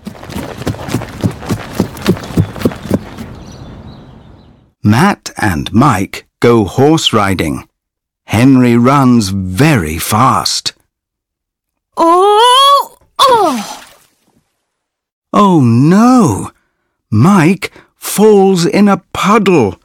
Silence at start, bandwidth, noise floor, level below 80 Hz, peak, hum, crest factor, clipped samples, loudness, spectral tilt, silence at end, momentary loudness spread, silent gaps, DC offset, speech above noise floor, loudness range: 0.05 s; 19 kHz; -77 dBFS; -40 dBFS; 0 dBFS; none; 12 dB; 0.2%; -10 LUFS; -5.5 dB/octave; 0.1 s; 16 LU; 15.12-15.22 s; under 0.1%; 69 dB; 7 LU